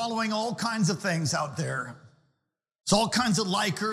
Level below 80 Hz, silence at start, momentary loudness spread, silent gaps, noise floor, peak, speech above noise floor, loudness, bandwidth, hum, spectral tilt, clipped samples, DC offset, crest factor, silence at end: -56 dBFS; 0 s; 8 LU; none; -81 dBFS; -10 dBFS; 54 dB; -27 LUFS; 15.5 kHz; none; -4 dB/octave; under 0.1%; under 0.1%; 18 dB; 0 s